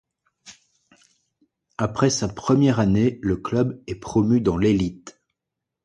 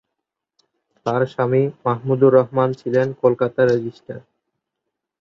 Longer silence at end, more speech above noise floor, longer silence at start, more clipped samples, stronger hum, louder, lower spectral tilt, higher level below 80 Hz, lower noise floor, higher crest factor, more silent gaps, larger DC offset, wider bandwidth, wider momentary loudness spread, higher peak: second, 0.75 s vs 1.05 s; about the same, 63 dB vs 63 dB; second, 0.45 s vs 1.05 s; neither; neither; about the same, -21 LUFS vs -19 LUFS; second, -6.5 dB/octave vs -9 dB/octave; first, -46 dBFS vs -62 dBFS; about the same, -84 dBFS vs -81 dBFS; about the same, 18 dB vs 18 dB; neither; neither; first, 11 kHz vs 7 kHz; second, 10 LU vs 16 LU; second, -6 dBFS vs -2 dBFS